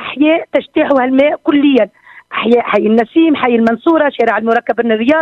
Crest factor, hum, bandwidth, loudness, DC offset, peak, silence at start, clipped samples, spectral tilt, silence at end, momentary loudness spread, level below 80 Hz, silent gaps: 12 dB; none; 6.2 kHz; -12 LUFS; under 0.1%; 0 dBFS; 0 s; under 0.1%; -7 dB/octave; 0 s; 4 LU; -54 dBFS; none